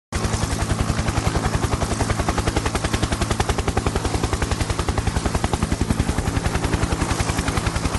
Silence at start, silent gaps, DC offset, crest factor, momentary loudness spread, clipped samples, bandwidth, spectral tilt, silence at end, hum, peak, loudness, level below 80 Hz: 0.1 s; none; under 0.1%; 18 dB; 1 LU; under 0.1%; 12 kHz; -5 dB/octave; 0 s; none; -4 dBFS; -23 LUFS; -28 dBFS